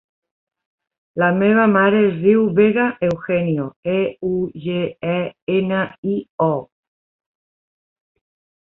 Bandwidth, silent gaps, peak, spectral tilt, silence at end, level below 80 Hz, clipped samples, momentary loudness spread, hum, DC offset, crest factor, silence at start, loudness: 4.1 kHz; 3.76-3.83 s, 5.42-5.47 s, 5.98-6.03 s, 6.30-6.38 s; -2 dBFS; -9.5 dB/octave; 2 s; -58 dBFS; under 0.1%; 9 LU; none; under 0.1%; 16 dB; 1.15 s; -18 LUFS